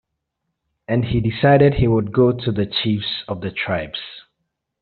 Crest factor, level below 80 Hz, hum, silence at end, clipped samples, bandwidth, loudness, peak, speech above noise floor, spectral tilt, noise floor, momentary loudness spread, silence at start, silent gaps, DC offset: 16 dB; -40 dBFS; none; 0.6 s; under 0.1%; 4.8 kHz; -19 LUFS; -2 dBFS; 59 dB; -5.5 dB/octave; -77 dBFS; 12 LU; 0.9 s; none; under 0.1%